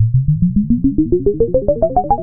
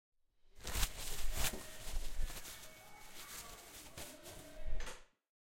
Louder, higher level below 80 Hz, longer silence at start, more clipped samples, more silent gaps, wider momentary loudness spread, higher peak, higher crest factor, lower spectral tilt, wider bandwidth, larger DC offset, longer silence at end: first, -15 LUFS vs -46 LUFS; first, -26 dBFS vs -46 dBFS; second, 0 s vs 0.55 s; neither; neither; second, 1 LU vs 13 LU; first, 0 dBFS vs -18 dBFS; second, 14 dB vs 22 dB; first, -18.5 dB/octave vs -2 dB/octave; second, 1.7 kHz vs 16.5 kHz; neither; second, 0 s vs 0.45 s